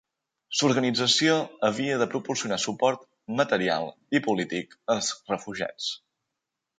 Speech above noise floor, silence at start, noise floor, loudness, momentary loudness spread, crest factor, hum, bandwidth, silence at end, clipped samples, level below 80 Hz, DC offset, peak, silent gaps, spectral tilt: 58 dB; 0.5 s; -85 dBFS; -26 LUFS; 11 LU; 20 dB; none; 9.6 kHz; 0.8 s; under 0.1%; -70 dBFS; under 0.1%; -8 dBFS; none; -3.5 dB/octave